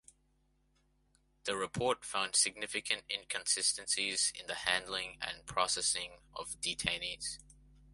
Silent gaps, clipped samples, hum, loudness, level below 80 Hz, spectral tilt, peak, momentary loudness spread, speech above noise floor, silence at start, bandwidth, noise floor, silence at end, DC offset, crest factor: none; under 0.1%; none; -34 LUFS; -64 dBFS; -0.5 dB/octave; -12 dBFS; 11 LU; 37 dB; 1.45 s; 12 kHz; -74 dBFS; 0.55 s; under 0.1%; 26 dB